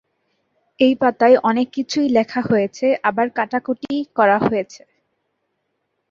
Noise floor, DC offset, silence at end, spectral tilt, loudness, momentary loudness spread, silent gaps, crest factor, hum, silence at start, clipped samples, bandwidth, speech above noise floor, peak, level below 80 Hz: -73 dBFS; under 0.1%; 1.35 s; -5.5 dB/octave; -18 LUFS; 9 LU; none; 18 dB; none; 0.8 s; under 0.1%; 7.6 kHz; 55 dB; -2 dBFS; -60 dBFS